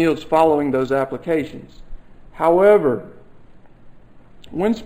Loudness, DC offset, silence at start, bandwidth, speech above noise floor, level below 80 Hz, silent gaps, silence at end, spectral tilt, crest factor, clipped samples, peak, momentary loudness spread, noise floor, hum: -18 LUFS; under 0.1%; 0 s; 14.5 kHz; 25 dB; -44 dBFS; none; 0 s; -7 dB/octave; 18 dB; under 0.1%; -2 dBFS; 16 LU; -43 dBFS; none